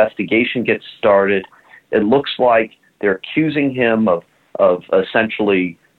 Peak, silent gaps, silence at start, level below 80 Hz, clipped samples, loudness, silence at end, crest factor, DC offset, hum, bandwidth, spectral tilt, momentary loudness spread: -2 dBFS; none; 0 s; -56 dBFS; under 0.1%; -16 LUFS; 0.25 s; 14 dB; under 0.1%; none; 4.6 kHz; -8 dB/octave; 6 LU